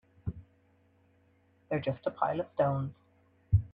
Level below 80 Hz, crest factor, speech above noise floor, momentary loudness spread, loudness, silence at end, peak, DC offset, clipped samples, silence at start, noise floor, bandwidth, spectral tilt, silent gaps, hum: -50 dBFS; 22 dB; 35 dB; 12 LU; -33 LUFS; 0.05 s; -14 dBFS; under 0.1%; under 0.1%; 0.25 s; -67 dBFS; 4.9 kHz; -10.5 dB/octave; none; none